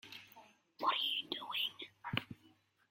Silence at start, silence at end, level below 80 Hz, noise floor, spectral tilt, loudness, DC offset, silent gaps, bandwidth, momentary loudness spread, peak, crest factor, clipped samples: 0.05 s; 0.4 s; -78 dBFS; -70 dBFS; -4 dB/octave; -38 LUFS; under 0.1%; none; 16.5 kHz; 20 LU; -16 dBFS; 28 dB; under 0.1%